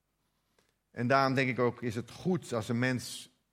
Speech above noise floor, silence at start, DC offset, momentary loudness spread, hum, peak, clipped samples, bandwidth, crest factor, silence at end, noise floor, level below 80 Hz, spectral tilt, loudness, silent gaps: 47 dB; 0.95 s; under 0.1%; 13 LU; none; -10 dBFS; under 0.1%; 16 kHz; 22 dB; 0.25 s; -78 dBFS; -72 dBFS; -6 dB/octave; -31 LUFS; none